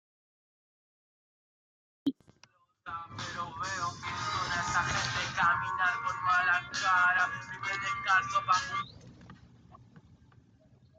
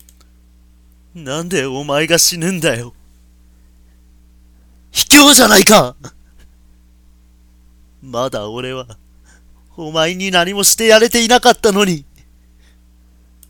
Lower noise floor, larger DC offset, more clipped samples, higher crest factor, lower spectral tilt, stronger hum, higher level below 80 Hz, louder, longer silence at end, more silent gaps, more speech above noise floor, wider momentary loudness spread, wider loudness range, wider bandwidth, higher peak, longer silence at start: first, -65 dBFS vs -47 dBFS; neither; second, under 0.1% vs 0.1%; about the same, 20 dB vs 16 dB; about the same, -2.5 dB/octave vs -2.5 dB/octave; neither; second, -62 dBFS vs -42 dBFS; second, -30 LUFS vs -11 LUFS; second, 1 s vs 1.5 s; neither; about the same, 34 dB vs 35 dB; second, 12 LU vs 19 LU; second, 12 LU vs 16 LU; second, 9.6 kHz vs over 20 kHz; second, -14 dBFS vs 0 dBFS; first, 2.05 s vs 1.15 s